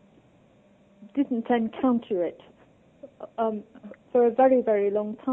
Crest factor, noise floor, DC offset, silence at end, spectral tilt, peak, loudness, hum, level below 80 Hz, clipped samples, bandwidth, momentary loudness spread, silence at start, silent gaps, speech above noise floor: 18 dB; -58 dBFS; under 0.1%; 0 s; -9 dB/octave; -10 dBFS; -25 LUFS; none; -68 dBFS; under 0.1%; 3.8 kHz; 16 LU; 1 s; none; 34 dB